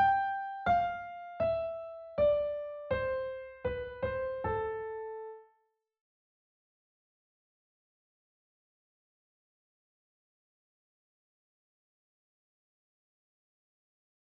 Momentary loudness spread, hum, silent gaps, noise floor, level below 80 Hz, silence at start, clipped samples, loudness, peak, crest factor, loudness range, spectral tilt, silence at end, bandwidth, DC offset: 13 LU; none; none; -77 dBFS; -58 dBFS; 0 s; under 0.1%; -34 LUFS; -18 dBFS; 20 dB; 12 LU; -4 dB/octave; 8.9 s; 6 kHz; under 0.1%